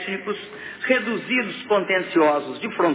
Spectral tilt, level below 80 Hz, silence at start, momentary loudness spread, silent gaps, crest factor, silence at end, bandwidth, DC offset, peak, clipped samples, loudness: -8.5 dB/octave; -68 dBFS; 0 s; 11 LU; none; 16 dB; 0 s; 4 kHz; under 0.1%; -6 dBFS; under 0.1%; -22 LUFS